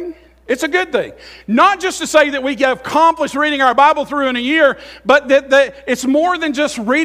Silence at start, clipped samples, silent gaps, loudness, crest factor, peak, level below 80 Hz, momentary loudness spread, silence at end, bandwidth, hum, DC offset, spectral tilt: 0 s; under 0.1%; none; -14 LUFS; 14 dB; 0 dBFS; -50 dBFS; 8 LU; 0 s; 15.5 kHz; none; under 0.1%; -3 dB/octave